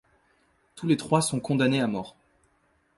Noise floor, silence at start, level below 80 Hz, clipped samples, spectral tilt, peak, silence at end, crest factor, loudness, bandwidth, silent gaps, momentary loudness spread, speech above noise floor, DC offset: -68 dBFS; 0.75 s; -64 dBFS; under 0.1%; -5 dB/octave; -8 dBFS; 0.85 s; 20 dB; -26 LUFS; 12 kHz; none; 12 LU; 43 dB; under 0.1%